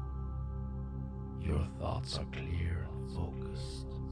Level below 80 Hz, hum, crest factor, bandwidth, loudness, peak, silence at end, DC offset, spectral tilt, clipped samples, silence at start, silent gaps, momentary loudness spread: -42 dBFS; none; 14 dB; 10.5 kHz; -39 LUFS; -24 dBFS; 0 s; under 0.1%; -6.5 dB/octave; under 0.1%; 0 s; none; 6 LU